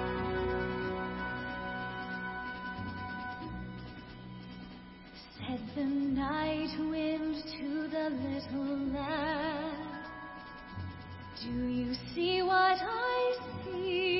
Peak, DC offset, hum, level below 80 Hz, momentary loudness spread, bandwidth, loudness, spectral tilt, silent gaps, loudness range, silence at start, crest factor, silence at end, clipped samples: -16 dBFS; under 0.1%; none; -54 dBFS; 16 LU; 5.8 kHz; -35 LUFS; -9 dB/octave; none; 9 LU; 0 s; 20 dB; 0 s; under 0.1%